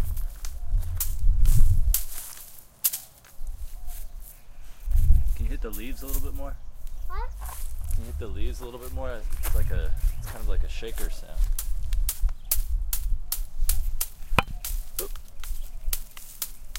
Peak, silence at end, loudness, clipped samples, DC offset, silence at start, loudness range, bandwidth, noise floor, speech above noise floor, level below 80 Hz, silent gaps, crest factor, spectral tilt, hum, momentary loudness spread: -2 dBFS; 0 s; -31 LUFS; under 0.1%; under 0.1%; 0 s; 7 LU; 17 kHz; -44 dBFS; 19 dB; -26 dBFS; none; 22 dB; -3.5 dB/octave; none; 17 LU